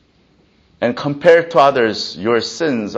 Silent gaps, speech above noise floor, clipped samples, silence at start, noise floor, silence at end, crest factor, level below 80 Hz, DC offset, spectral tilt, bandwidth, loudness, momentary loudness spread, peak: none; 40 dB; under 0.1%; 0.8 s; -55 dBFS; 0 s; 16 dB; -58 dBFS; under 0.1%; -5 dB/octave; 8 kHz; -15 LUFS; 10 LU; 0 dBFS